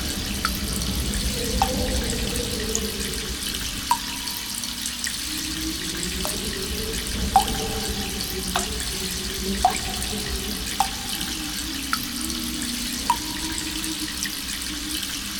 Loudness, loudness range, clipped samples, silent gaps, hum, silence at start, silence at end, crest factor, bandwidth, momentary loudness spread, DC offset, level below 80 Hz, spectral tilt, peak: -25 LUFS; 2 LU; under 0.1%; none; none; 0 s; 0 s; 24 dB; 18 kHz; 4 LU; under 0.1%; -34 dBFS; -2.5 dB/octave; -2 dBFS